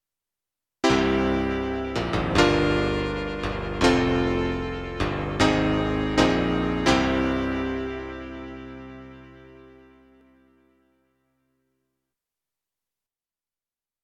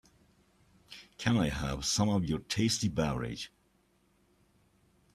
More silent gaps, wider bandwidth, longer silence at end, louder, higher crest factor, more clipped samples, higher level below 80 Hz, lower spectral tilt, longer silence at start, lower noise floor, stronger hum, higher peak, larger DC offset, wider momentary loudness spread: neither; second, 12 kHz vs 14.5 kHz; first, 4.45 s vs 1.65 s; first, -24 LUFS vs -31 LUFS; about the same, 20 dB vs 22 dB; neither; first, -40 dBFS vs -52 dBFS; about the same, -5.5 dB/octave vs -4.5 dB/octave; about the same, 0.85 s vs 0.9 s; first, under -90 dBFS vs -70 dBFS; neither; first, -6 dBFS vs -12 dBFS; neither; about the same, 16 LU vs 17 LU